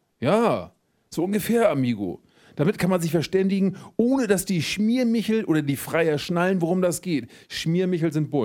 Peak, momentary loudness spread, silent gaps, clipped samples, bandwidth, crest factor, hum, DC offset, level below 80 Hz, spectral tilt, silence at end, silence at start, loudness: -6 dBFS; 8 LU; none; under 0.1%; 19 kHz; 16 dB; none; under 0.1%; -58 dBFS; -6 dB/octave; 0 s; 0.2 s; -23 LUFS